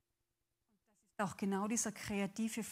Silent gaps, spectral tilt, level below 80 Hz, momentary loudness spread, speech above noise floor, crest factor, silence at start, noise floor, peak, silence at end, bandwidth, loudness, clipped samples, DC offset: none; -4 dB/octave; -72 dBFS; 6 LU; 48 dB; 18 dB; 1.2 s; -88 dBFS; -22 dBFS; 0 s; 16 kHz; -39 LUFS; under 0.1%; under 0.1%